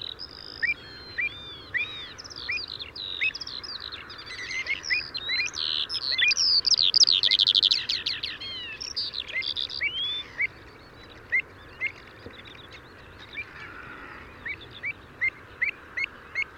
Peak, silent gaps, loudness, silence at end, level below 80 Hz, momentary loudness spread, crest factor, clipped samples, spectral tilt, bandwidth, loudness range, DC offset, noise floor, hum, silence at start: -8 dBFS; none; -25 LUFS; 0 s; -58 dBFS; 22 LU; 22 dB; under 0.1%; 0.5 dB/octave; 16.5 kHz; 14 LU; under 0.1%; -48 dBFS; none; 0 s